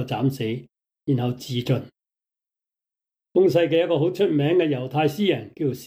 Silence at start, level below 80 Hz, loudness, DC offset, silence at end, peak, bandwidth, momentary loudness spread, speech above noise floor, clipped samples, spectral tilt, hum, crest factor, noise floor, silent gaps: 0 s; -66 dBFS; -22 LUFS; under 0.1%; 0 s; -8 dBFS; 16.5 kHz; 9 LU; 65 dB; under 0.1%; -7 dB/octave; none; 14 dB; -87 dBFS; none